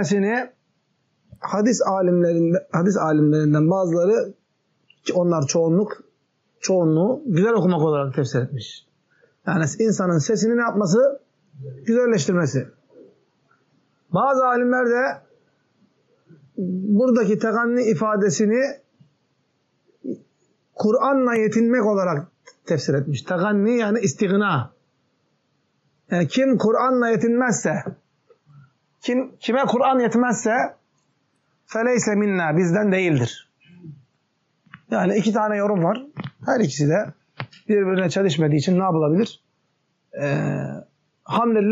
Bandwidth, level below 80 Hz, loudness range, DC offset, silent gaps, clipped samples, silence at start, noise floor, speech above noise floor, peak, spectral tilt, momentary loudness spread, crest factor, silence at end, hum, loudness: 8 kHz; -70 dBFS; 3 LU; under 0.1%; none; under 0.1%; 0 s; -70 dBFS; 50 dB; -8 dBFS; -6 dB/octave; 13 LU; 12 dB; 0 s; none; -20 LUFS